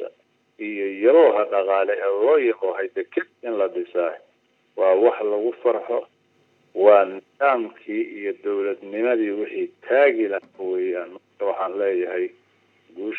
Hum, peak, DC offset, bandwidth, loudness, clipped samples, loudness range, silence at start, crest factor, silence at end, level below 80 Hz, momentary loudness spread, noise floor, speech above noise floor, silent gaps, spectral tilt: none; -2 dBFS; under 0.1%; 4.1 kHz; -22 LUFS; under 0.1%; 3 LU; 0 s; 20 dB; 0 s; under -90 dBFS; 12 LU; -64 dBFS; 43 dB; none; -7 dB/octave